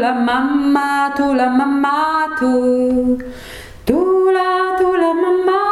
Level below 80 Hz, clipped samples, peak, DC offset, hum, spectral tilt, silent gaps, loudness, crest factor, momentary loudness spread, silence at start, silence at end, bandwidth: -44 dBFS; under 0.1%; -2 dBFS; under 0.1%; none; -5.5 dB/octave; none; -15 LUFS; 14 dB; 5 LU; 0 s; 0 s; 13.5 kHz